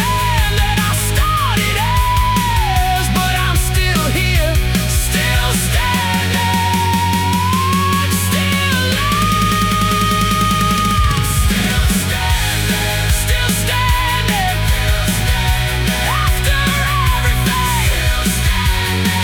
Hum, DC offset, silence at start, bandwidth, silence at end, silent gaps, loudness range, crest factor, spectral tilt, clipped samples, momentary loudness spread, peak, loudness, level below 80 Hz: none; under 0.1%; 0 s; 19 kHz; 0 s; none; 1 LU; 12 dB; -4 dB/octave; under 0.1%; 2 LU; -2 dBFS; -15 LUFS; -20 dBFS